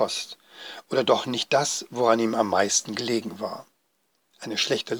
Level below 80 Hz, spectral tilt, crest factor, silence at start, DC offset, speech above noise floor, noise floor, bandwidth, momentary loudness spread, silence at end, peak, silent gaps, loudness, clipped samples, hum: -78 dBFS; -2.5 dB/octave; 20 dB; 0 s; under 0.1%; 46 dB; -71 dBFS; over 20 kHz; 18 LU; 0 s; -6 dBFS; none; -24 LUFS; under 0.1%; none